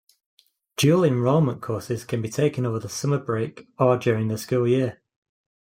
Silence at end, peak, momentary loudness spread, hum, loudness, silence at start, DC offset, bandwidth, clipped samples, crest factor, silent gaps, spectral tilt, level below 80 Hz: 0.85 s; -6 dBFS; 9 LU; none; -23 LUFS; 0.8 s; under 0.1%; 16.5 kHz; under 0.1%; 18 dB; none; -6.5 dB/octave; -64 dBFS